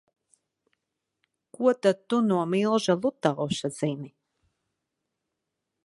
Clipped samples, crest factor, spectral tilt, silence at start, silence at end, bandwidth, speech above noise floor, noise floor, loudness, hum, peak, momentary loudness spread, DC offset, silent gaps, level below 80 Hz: under 0.1%; 22 dB; -6 dB/octave; 1.6 s; 1.75 s; 11.5 kHz; 58 dB; -84 dBFS; -26 LUFS; none; -6 dBFS; 8 LU; under 0.1%; none; -70 dBFS